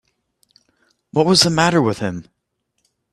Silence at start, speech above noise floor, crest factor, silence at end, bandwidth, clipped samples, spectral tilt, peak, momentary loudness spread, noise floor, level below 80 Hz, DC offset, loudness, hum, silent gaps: 1.15 s; 57 dB; 20 dB; 0.9 s; 13 kHz; under 0.1%; -4 dB/octave; 0 dBFS; 13 LU; -73 dBFS; -54 dBFS; under 0.1%; -16 LUFS; none; none